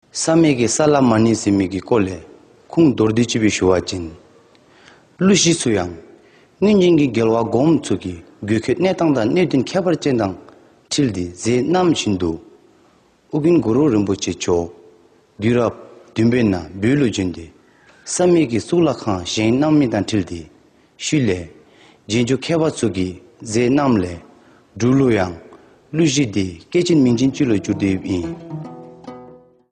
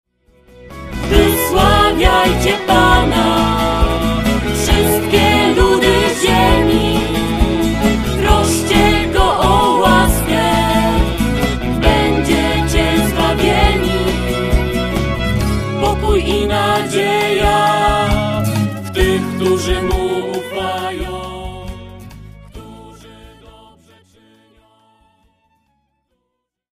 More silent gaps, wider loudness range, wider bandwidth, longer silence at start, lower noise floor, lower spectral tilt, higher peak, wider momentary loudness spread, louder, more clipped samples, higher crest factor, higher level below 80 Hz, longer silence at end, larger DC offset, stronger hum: neither; second, 4 LU vs 7 LU; second, 10.5 kHz vs 15.5 kHz; second, 0.15 s vs 0.6 s; second, -54 dBFS vs -73 dBFS; about the same, -5.5 dB/octave vs -5 dB/octave; about the same, -2 dBFS vs 0 dBFS; first, 14 LU vs 8 LU; second, -17 LUFS vs -14 LUFS; neither; about the same, 16 dB vs 14 dB; second, -48 dBFS vs -22 dBFS; second, 0.4 s vs 3.65 s; neither; neither